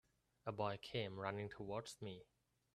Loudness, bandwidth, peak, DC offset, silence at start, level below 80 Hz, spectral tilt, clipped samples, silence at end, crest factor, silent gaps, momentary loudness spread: -47 LUFS; 13 kHz; -26 dBFS; under 0.1%; 0.45 s; -76 dBFS; -5.5 dB/octave; under 0.1%; 0.5 s; 22 dB; none; 9 LU